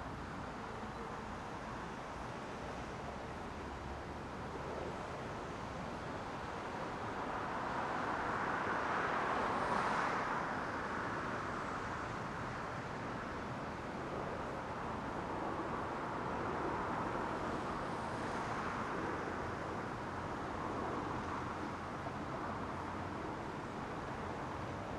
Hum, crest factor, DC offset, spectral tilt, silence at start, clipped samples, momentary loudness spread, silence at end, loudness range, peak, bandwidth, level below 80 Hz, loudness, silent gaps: none; 18 dB; under 0.1%; -5.5 dB/octave; 0 s; under 0.1%; 9 LU; 0 s; 8 LU; -24 dBFS; 12 kHz; -58 dBFS; -41 LUFS; none